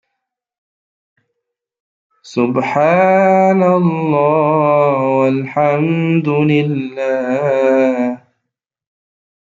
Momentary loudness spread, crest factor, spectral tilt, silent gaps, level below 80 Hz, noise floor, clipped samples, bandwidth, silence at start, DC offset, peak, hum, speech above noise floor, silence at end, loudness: 8 LU; 14 dB; -8.5 dB/octave; none; -62 dBFS; -77 dBFS; under 0.1%; 7.6 kHz; 2.25 s; under 0.1%; -2 dBFS; none; 64 dB; 1.3 s; -14 LUFS